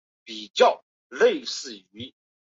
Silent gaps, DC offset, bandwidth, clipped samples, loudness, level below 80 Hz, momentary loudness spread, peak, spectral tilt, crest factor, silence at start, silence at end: 0.50-0.54 s, 0.83-1.10 s; under 0.1%; 7.8 kHz; under 0.1%; -23 LUFS; -72 dBFS; 21 LU; -6 dBFS; -2 dB/octave; 20 dB; 0.3 s; 0.4 s